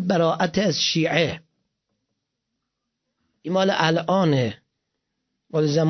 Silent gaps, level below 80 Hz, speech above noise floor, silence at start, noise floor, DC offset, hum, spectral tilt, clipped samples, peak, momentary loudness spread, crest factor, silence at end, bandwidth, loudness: none; -60 dBFS; 59 dB; 0 s; -80 dBFS; under 0.1%; none; -5 dB/octave; under 0.1%; -4 dBFS; 9 LU; 20 dB; 0 s; 6.4 kHz; -21 LUFS